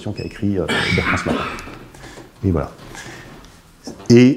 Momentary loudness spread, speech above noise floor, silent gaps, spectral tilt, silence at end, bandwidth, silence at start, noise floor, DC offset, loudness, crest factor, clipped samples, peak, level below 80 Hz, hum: 21 LU; 27 dB; none; -6 dB/octave; 0 s; 13 kHz; 0 s; -44 dBFS; under 0.1%; -19 LUFS; 18 dB; under 0.1%; 0 dBFS; -40 dBFS; none